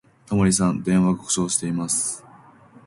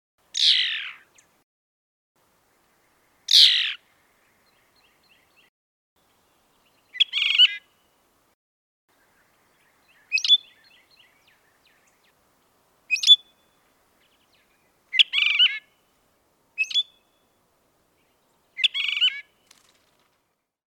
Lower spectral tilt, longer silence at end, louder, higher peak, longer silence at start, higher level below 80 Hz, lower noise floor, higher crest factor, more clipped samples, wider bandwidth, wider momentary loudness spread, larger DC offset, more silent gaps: first, -4.5 dB/octave vs 5 dB/octave; second, 0.65 s vs 1.55 s; second, -21 LUFS vs -18 LUFS; about the same, -6 dBFS vs -4 dBFS; about the same, 0.3 s vs 0.35 s; first, -48 dBFS vs -82 dBFS; second, -49 dBFS vs -74 dBFS; second, 16 dB vs 24 dB; neither; second, 11.5 kHz vs 18.5 kHz; second, 7 LU vs 22 LU; neither; second, none vs 1.43-2.15 s, 5.49-5.96 s, 8.34-8.88 s